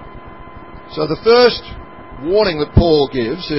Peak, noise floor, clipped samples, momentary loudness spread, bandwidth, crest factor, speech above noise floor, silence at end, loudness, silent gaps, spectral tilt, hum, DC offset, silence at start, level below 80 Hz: 0 dBFS; -35 dBFS; under 0.1%; 25 LU; 5.8 kHz; 16 dB; 21 dB; 0 s; -14 LUFS; none; -9.5 dB/octave; none; 0.8%; 0 s; -28 dBFS